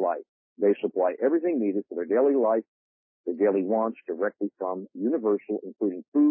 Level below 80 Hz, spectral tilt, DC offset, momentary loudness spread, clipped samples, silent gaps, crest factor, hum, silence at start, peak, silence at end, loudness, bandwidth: -88 dBFS; -11.5 dB/octave; under 0.1%; 9 LU; under 0.1%; 0.29-0.56 s, 2.68-3.24 s, 6.08-6.12 s; 14 dB; none; 0 s; -12 dBFS; 0 s; -26 LUFS; 3.4 kHz